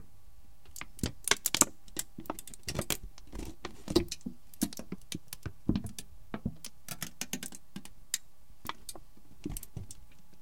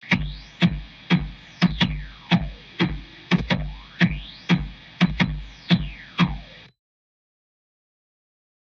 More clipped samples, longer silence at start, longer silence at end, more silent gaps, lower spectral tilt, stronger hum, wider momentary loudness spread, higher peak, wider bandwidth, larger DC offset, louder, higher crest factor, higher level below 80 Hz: neither; first, 0.45 s vs 0.05 s; second, 0.3 s vs 2.1 s; neither; second, -2.5 dB/octave vs -6.5 dB/octave; neither; first, 18 LU vs 14 LU; about the same, -2 dBFS vs -4 dBFS; first, 17 kHz vs 6.8 kHz; first, 0.7% vs under 0.1%; second, -36 LUFS vs -24 LUFS; first, 38 dB vs 22 dB; second, -52 dBFS vs -38 dBFS